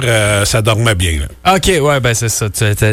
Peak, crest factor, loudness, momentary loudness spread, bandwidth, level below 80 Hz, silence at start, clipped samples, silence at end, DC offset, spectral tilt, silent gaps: 0 dBFS; 12 dB; -12 LUFS; 4 LU; 16.5 kHz; -26 dBFS; 0 s; under 0.1%; 0 s; under 0.1%; -4 dB/octave; none